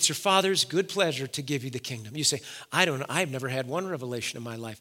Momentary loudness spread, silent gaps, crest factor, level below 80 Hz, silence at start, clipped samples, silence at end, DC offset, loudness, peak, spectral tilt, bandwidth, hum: 12 LU; none; 24 dB; -76 dBFS; 0 s; under 0.1%; 0 s; under 0.1%; -27 LUFS; -4 dBFS; -3 dB/octave; 17 kHz; none